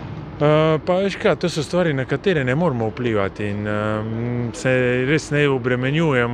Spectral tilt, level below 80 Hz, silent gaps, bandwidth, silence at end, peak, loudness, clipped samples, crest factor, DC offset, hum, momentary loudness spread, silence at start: -6.5 dB/octave; -46 dBFS; none; 11 kHz; 0 s; -4 dBFS; -20 LUFS; under 0.1%; 16 dB; under 0.1%; none; 6 LU; 0 s